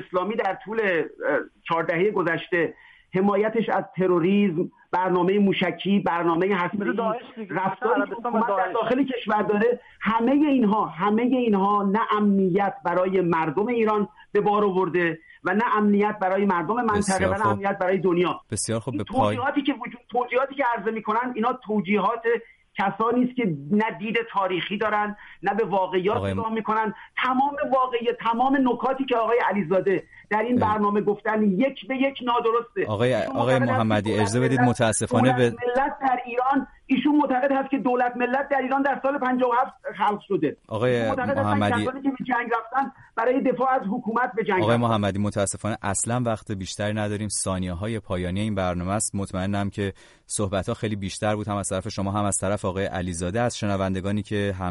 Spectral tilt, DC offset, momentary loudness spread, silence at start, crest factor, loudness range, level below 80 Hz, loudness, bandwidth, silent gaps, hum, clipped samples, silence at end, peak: -5.5 dB/octave; under 0.1%; 7 LU; 0 s; 16 dB; 4 LU; -56 dBFS; -24 LUFS; 11.5 kHz; none; none; under 0.1%; 0 s; -8 dBFS